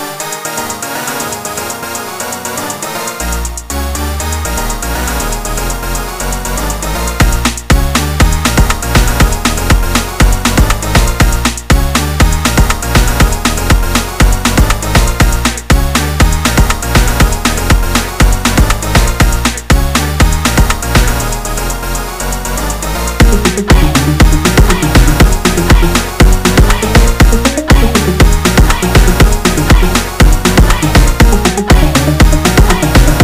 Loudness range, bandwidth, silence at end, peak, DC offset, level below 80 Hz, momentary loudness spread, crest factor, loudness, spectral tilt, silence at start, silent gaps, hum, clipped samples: 7 LU; 16.5 kHz; 0 s; 0 dBFS; 2%; -12 dBFS; 8 LU; 10 dB; -11 LUFS; -4.5 dB/octave; 0 s; none; none; 1%